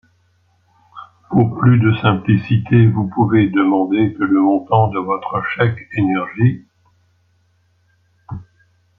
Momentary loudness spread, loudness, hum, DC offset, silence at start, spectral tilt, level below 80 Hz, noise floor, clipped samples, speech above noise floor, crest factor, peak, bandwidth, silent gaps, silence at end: 8 LU; -16 LUFS; none; under 0.1%; 0.95 s; -11 dB/octave; -50 dBFS; -59 dBFS; under 0.1%; 45 dB; 16 dB; -2 dBFS; 3.9 kHz; none; 0.55 s